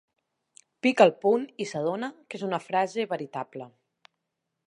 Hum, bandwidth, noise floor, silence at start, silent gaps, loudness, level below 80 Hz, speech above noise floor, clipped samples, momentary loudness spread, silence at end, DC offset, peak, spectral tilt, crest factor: none; 11 kHz; -82 dBFS; 0.85 s; none; -27 LUFS; -84 dBFS; 56 dB; under 0.1%; 16 LU; 1 s; under 0.1%; -4 dBFS; -5.5 dB/octave; 24 dB